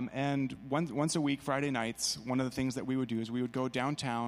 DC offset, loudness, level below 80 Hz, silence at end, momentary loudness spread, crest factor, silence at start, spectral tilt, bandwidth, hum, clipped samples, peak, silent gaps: under 0.1%; -34 LUFS; -64 dBFS; 0 s; 3 LU; 16 dB; 0 s; -5 dB/octave; 15 kHz; none; under 0.1%; -16 dBFS; none